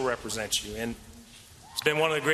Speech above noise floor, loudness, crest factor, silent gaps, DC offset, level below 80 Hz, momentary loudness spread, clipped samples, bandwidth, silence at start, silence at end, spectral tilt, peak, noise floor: 22 dB; -29 LUFS; 22 dB; none; under 0.1%; -54 dBFS; 23 LU; under 0.1%; 14.5 kHz; 0 s; 0 s; -2.5 dB/octave; -8 dBFS; -51 dBFS